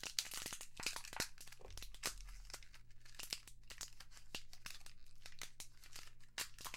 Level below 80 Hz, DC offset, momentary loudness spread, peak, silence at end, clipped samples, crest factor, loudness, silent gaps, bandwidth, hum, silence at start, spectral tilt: -60 dBFS; under 0.1%; 14 LU; -18 dBFS; 0 s; under 0.1%; 32 dB; -49 LUFS; none; 17 kHz; none; 0 s; -0.5 dB/octave